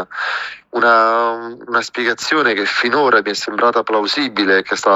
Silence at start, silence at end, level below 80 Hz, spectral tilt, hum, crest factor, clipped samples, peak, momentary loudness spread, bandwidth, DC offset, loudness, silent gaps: 0 s; 0 s; -62 dBFS; -2.5 dB/octave; none; 14 dB; under 0.1%; -2 dBFS; 9 LU; 15 kHz; under 0.1%; -15 LUFS; none